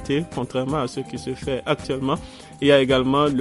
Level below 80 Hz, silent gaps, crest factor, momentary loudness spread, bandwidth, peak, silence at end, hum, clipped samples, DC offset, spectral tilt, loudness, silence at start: -46 dBFS; none; 18 dB; 12 LU; 11.5 kHz; -4 dBFS; 0 s; none; under 0.1%; under 0.1%; -6 dB/octave; -22 LUFS; 0 s